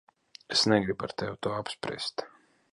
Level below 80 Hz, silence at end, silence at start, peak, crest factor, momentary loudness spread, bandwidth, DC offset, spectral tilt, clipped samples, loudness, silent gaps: -62 dBFS; 0.45 s; 0.5 s; -10 dBFS; 22 dB; 11 LU; 11.5 kHz; under 0.1%; -4 dB/octave; under 0.1%; -29 LUFS; none